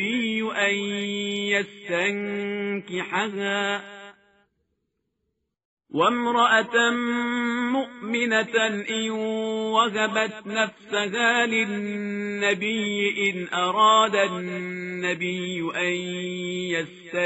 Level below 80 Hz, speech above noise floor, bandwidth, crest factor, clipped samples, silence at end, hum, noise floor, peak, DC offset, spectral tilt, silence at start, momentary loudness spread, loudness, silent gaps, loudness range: -72 dBFS; 53 dB; 8 kHz; 18 dB; under 0.1%; 0 s; none; -78 dBFS; -6 dBFS; under 0.1%; -2 dB/octave; 0 s; 10 LU; -24 LUFS; 5.65-5.77 s; 6 LU